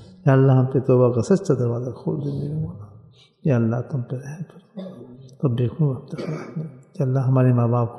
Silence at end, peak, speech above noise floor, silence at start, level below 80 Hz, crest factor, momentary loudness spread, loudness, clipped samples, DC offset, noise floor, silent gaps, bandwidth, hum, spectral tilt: 0 s; -4 dBFS; 29 dB; 0 s; -58 dBFS; 16 dB; 19 LU; -21 LUFS; under 0.1%; under 0.1%; -49 dBFS; none; 8.4 kHz; none; -9 dB/octave